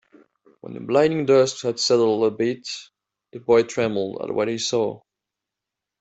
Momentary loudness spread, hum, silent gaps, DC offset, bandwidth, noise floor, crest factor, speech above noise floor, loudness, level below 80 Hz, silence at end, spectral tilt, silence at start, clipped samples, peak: 16 LU; none; none; under 0.1%; 8.2 kHz; -86 dBFS; 18 dB; 65 dB; -21 LUFS; -64 dBFS; 1.05 s; -4.5 dB/octave; 0.65 s; under 0.1%; -4 dBFS